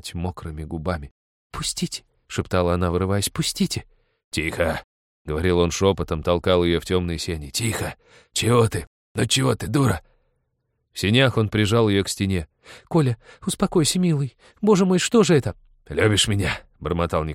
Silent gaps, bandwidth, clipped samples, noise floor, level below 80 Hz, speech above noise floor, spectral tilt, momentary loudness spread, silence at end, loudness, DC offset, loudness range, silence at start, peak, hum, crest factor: 1.11-1.50 s, 4.24-4.31 s, 4.84-5.25 s, 8.87-9.15 s; 16.5 kHz; under 0.1%; -73 dBFS; -42 dBFS; 52 dB; -5 dB/octave; 12 LU; 0 s; -22 LUFS; under 0.1%; 4 LU; 0.05 s; -4 dBFS; none; 18 dB